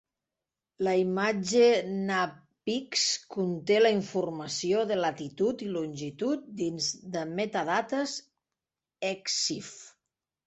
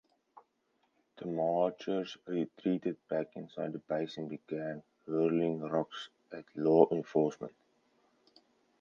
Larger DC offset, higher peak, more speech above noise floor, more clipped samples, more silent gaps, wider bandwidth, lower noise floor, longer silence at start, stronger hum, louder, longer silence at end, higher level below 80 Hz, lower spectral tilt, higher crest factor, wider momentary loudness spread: neither; second, -12 dBFS vs -8 dBFS; first, 61 dB vs 44 dB; neither; neither; first, 8.4 kHz vs 7.2 kHz; first, -90 dBFS vs -77 dBFS; first, 0.8 s vs 0.35 s; neither; first, -29 LUFS vs -34 LUFS; second, 0.6 s vs 1.3 s; first, -72 dBFS vs -82 dBFS; second, -3.5 dB/octave vs -7.5 dB/octave; second, 18 dB vs 26 dB; second, 11 LU vs 17 LU